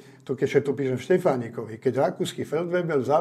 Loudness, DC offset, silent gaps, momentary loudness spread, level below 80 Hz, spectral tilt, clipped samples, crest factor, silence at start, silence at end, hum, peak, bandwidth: -25 LUFS; under 0.1%; none; 7 LU; -72 dBFS; -6.5 dB/octave; under 0.1%; 18 dB; 0.05 s; 0 s; none; -6 dBFS; 14 kHz